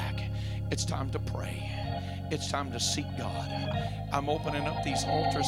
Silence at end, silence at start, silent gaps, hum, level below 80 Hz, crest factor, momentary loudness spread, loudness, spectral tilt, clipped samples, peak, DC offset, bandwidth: 0 s; 0 s; none; none; -44 dBFS; 20 dB; 6 LU; -32 LUFS; -4.5 dB/octave; under 0.1%; -12 dBFS; under 0.1%; 15.5 kHz